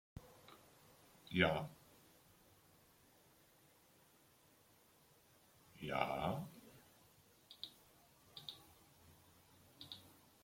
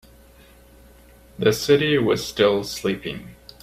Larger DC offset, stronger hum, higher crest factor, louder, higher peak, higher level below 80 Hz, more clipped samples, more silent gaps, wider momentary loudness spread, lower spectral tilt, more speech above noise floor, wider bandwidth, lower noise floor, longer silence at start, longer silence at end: neither; neither; first, 30 dB vs 20 dB; second, -43 LUFS vs -21 LUFS; second, -18 dBFS vs -4 dBFS; second, -72 dBFS vs -50 dBFS; neither; neither; first, 29 LU vs 15 LU; about the same, -5.5 dB/octave vs -5 dB/octave; about the same, 32 dB vs 29 dB; about the same, 16.5 kHz vs 16 kHz; first, -71 dBFS vs -50 dBFS; second, 0.15 s vs 1.4 s; about the same, 0.35 s vs 0.3 s